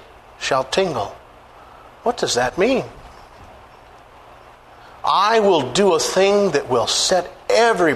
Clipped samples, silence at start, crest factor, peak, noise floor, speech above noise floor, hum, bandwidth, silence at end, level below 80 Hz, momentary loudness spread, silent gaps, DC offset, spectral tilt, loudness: under 0.1%; 0.4 s; 16 dB; -2 dBFS; -45 dBFS; 27 dB; 60 Hz at -55 dBFS; 13.5 kHz; 0 s; -50 dBFS; 10 LU; none; under 0.1%; -3 dB/octave; -18 LUFS